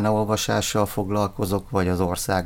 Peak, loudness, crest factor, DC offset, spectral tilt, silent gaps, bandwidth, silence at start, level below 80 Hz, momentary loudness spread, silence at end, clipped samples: -6 dBFS; -23 LUFS; 16 dB; under 0.1%; -5 dB/octave; none; 17 kHz; 0 s; -42 dBFS; 2 LU; 0 s; under 0.1%